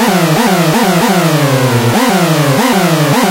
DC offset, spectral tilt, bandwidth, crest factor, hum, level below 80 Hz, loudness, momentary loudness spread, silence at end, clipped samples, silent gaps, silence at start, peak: under 0.1%; -5 dB/octave; 16 kHz; 10 dB; none; -46 dBFS; -10 LUFS; 1 LU; 0 s; under 0.1%; none; 0 s; 0 dBFS